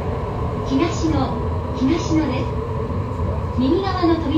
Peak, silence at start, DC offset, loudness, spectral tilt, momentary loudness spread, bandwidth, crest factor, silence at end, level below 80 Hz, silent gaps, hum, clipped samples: -4 dBFS; 0 s; under 0.1%; -21 LUFS; -7 dB/octave; 6 LU; 8.6 kHz; 16 dB; 0 s; -32 dBFS; none; none; under 0.1%